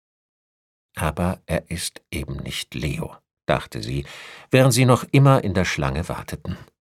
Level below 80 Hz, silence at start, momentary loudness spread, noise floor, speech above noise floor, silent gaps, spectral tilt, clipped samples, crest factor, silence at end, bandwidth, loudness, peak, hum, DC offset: -40 dBFS; 0.95 s; 17 LU; under -90 dBFS; over 68 dB; none; -5.5 dB/octave; under 0.1%; 22 dB; 0.2 s; 15 kHz; -22 LUFS; -2 dBFS; none; under 0.1%